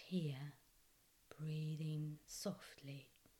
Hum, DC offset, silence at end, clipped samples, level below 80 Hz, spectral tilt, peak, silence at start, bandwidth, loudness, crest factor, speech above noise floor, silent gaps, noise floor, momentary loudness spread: none; under 0.1%; 0.3 s; under 0.1%; -80 dBFS; -6 dB/octave; -32 dBFS; 0 s; 18.5 kHz; -48 LUFS; 16 dB; 27 dB; none; -73 dBFS; 11 LU